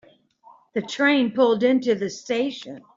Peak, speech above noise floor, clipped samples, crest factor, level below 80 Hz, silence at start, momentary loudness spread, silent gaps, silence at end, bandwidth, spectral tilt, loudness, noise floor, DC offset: -6 dBFS; 32 dB; under 0.1%; 16 dB; -70 dBFS; 0.75 s; 11 LU; none; 0.15 s; 7.6 kHz; -4.5 dB/octave; -22 LUFS; -54 dBFS; under 0.1%